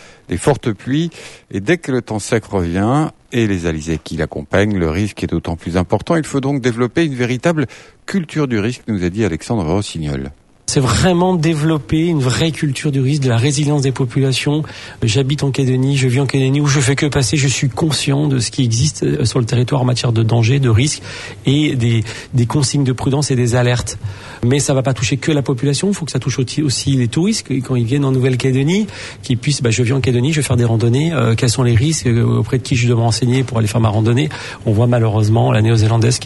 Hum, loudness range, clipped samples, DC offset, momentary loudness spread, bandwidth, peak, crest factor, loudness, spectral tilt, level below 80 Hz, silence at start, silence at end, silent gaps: none; 3 LU; under 0.1%; under 0.1%; 7 LU; 12 kHz; 0 dBFS; 14 dB; -16 LUFS; -5.5 dB/octave; -40 dBFS; 0 s; 0 s; none